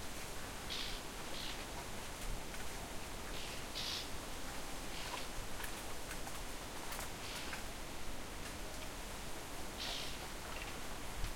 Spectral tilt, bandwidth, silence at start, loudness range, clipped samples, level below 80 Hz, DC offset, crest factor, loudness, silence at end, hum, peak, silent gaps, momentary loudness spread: -2.5 dB/octave; 16.5 kHz; 0 s; 1 LU; under 0.1%; -50 dBFS; under 0.1%; 16 dB; -45 LUFS; 0 s; none; -26 dBFS; none; 5 LU